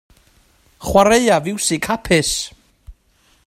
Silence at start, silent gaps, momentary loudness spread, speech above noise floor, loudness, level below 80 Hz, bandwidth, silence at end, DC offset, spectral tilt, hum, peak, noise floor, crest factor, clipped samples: 0.8 s; none; 11 LU; 42 dB; -16 LUFS; -40 dBFS; 16 kHz; 0.55 s; under 0.1%; -3.5 dB/octave; none; 0 dBFS; -57 dBFS; 18 dB; under 0.1%